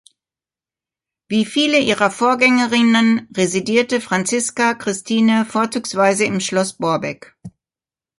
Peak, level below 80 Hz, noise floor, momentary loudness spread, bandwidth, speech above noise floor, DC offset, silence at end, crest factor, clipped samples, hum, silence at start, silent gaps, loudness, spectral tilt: 0 dBFS; -62 dBFS; under -90 dBFS; 7 LU; 11.5 kHz; over 73 dB; under 0.1%; 0.7 s; 18 dB; under 0.1%; none; 1.3 s; none; -17 LUFS; -3.5 dB/octave